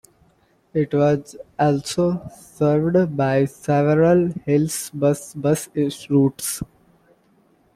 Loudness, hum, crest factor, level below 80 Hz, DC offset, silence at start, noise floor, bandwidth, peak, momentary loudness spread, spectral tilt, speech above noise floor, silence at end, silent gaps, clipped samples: -20 LUFS; none; 14 dB; -54 dBFS; under 0.1%; 0.75 s; -60 dBFS; 16 kHz; -6 dBFS; 10 LU; -6.5 dB/octave; 40 dB; 1.1 s; none; under 0.1%